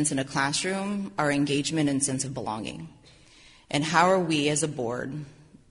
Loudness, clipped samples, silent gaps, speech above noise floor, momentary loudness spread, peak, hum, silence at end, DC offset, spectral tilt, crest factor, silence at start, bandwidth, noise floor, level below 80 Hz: -26 LUFS; under 0.1%; none; 28 dB; 15 LU; -6 dBFS; none; 0.4 s; under 0.1%; -4 dB/octave; 22 dB; 0 s; 11 kHz; -54 dBFS; -60 dBFS